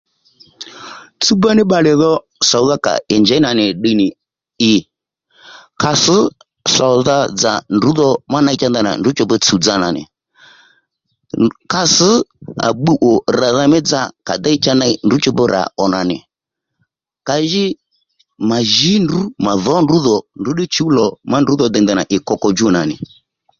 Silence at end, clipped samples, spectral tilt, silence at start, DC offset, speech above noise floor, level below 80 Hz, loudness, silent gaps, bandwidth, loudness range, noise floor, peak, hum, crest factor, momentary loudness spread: 0.55 s; under 0.1%; -4 dB/octave; 0.6 s; under 0.1%; 66 dB; -50 dBFS; -13 LUFS; none; 7.8 kHz; 3 LU; -79 dBFS; 0 dBFS; none; 14 dB; 9 LU